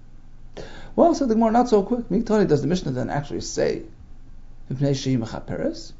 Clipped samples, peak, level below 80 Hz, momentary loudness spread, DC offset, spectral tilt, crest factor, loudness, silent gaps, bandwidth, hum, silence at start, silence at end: under 0.1%; -4 dBFS; -40 dBFS; 13 LU; under 0.1%; -6.5 dB/octave; 18 dB; -22 LUFS; none; 7.8 kHz; none; 0 s; 0 s